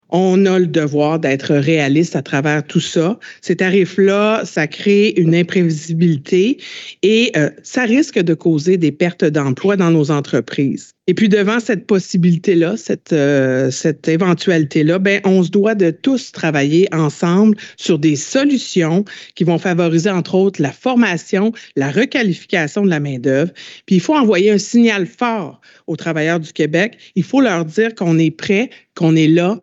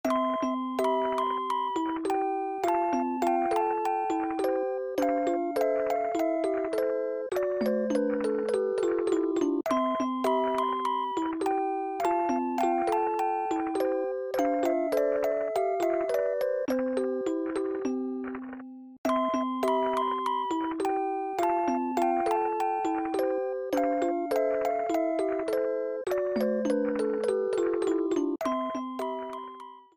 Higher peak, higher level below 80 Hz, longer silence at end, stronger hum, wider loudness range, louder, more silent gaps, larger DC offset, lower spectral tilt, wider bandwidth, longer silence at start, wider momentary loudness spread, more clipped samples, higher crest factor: first, -4 dBFS vs -14 dBFS; about the same, -66 dBFS vs -68 dBFS; about the same, 0.05 s vs 0.15 s; neither; about the same, 2 LU vs 2 LU; first, -15 LUFS vs -29 LUFS; second, none vs 18.98-19.04 s; neither; about the same, -6 dB/octave vs -5 dB/octave; second, 8 kHz vs 18 kHz; about the same, 0.1 s vs 0.05 s; about the same, 6 LU vs 4 LU; neither; about the same, 12 dB vs 14 dB